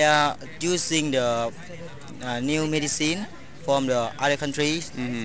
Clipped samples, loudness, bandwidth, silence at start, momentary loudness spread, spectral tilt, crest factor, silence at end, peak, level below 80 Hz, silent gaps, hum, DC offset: under 0.1%; -24 LUFS; 8 kHz; 0 s; 14 LU; -3.5 dB/octave; 20 dB; 0 s; -6 dBFS; -54 dBFS; none; none; 1%